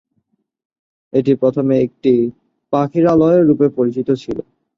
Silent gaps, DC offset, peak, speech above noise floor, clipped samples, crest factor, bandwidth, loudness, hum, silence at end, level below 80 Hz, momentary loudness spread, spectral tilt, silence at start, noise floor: none; under 0.1%; -2 dBFS; 53 dB; under 0.1%; 14 dB; 7.2 kHz; -15 LUFS; none; 0.35 s; -54 dBFS; 9 LU; -9.5 dB/octave; 1.15 s; -67 dBFS